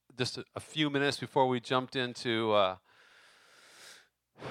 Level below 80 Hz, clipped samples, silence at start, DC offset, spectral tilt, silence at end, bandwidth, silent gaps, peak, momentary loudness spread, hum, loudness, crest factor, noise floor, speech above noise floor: -78 dBFS; under 0.1%; 0.2 s; under 0.1%; -4.5 dB/octave; 0 s; 15 kHz; none; -12 dBFS; 22 LU; none; -31 LUFS; 20 dB; -61 dBFS; 30 dB